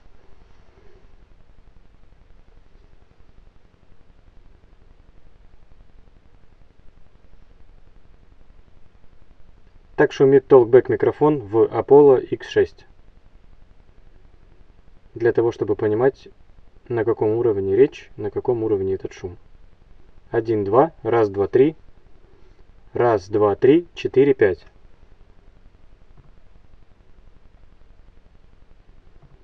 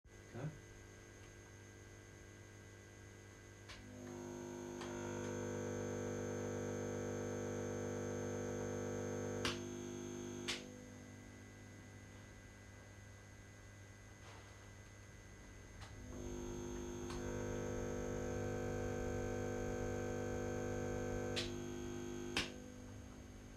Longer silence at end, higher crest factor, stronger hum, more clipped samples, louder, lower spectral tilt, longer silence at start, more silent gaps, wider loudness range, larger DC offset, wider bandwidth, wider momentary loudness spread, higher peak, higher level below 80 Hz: first, 4.9 s vs 0 s; about the same, 22 dB vs 24 dB; neither; neither; first, -18 LUFS vs -45 LUFS; first, -8 dB/octave vs -5 dB/octave; about the same, 0.1 s vs 0.05 s; neither; second, 8 LU vs 14 LU; neither; second, 6.4 kHz vs 14 kHz; about the same, 14 LU vs 15 LU; first, -2 dBFS vs -22 dBFS; first, -50 dBFS vs -60 dBFS